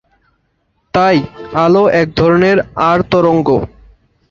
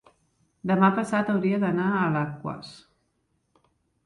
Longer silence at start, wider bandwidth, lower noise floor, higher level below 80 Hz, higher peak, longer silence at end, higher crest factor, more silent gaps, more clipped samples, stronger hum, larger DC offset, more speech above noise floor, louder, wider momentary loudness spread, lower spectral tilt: first, 0.95 s vs 0.65 s; second, 7.4 kHz vs 11 kHz; second, -62 dBFS vs -73 dBFS; first, -40 dBFS vs -64 dBFS; first, -2 dBFS vs -8 dBFS; second, 0.65 s vs 1.3 s; second, 12 dB vs 20 dB; neither; neither; neither; neither; about the same, 51 dB vs 48 dB; first, -12 LUFS vs -25 LUFS; second, 7 LU vs 15 LU; about the same, -7.5 dB/octave vs -7.5 dB/octave